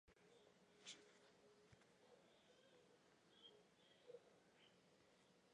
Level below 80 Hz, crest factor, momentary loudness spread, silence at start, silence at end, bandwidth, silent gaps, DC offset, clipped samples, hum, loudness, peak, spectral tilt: under -90 dBFS; 24 dB; 7 LU; 0.05 s; 0 s; 10 kHz; none; under 0.1%; under 0.1%; none; -65 LUFS; -46 dBFS; -2.5 dB/octave